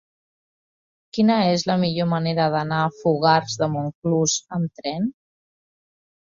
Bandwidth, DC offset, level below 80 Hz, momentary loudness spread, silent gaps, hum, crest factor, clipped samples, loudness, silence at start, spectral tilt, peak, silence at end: 7.6 kHz; under 0.1%; -62 dBFS; 9 LU; 3.95-4.02 s; none; 20 dB; under 0.1%; -22 LUFS; 1.15 s; -5 dB/octave; -2 dBFS; 1.3 s